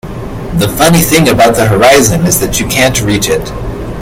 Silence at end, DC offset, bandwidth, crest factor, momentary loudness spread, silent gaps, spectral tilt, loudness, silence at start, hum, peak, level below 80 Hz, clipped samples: 0 s; under 0.1%; over 20 kHz; 10 dB; 15 LU; none; -4 dB/octave; -8 LUFS; 0.05 s; none; 0 dBFS; -26 dBFS; 1%